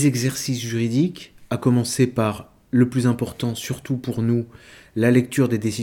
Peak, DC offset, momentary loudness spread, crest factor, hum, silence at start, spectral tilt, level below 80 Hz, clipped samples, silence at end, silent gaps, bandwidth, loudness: -4 dBFS; under 0.1%; 10 LU; 16 dB; none; 0 s; -6 dB/octave; -56 dBFS; under 0.1%; 0 s; none; 18 kHz; -22 LUFS